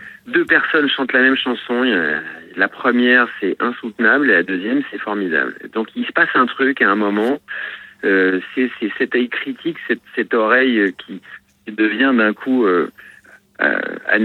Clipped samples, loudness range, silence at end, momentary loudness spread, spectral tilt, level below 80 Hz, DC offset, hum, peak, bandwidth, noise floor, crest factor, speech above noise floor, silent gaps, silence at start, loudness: under 0.1%; 3 LU; 0 s; 11 LU; -6 dB/octave; -70 dBFS; under 0.1%; none; 0 dBFS; 4.5 kHz; -46 dBFS; 16 dB; 29 dB; none; 0 s; -17 LUFS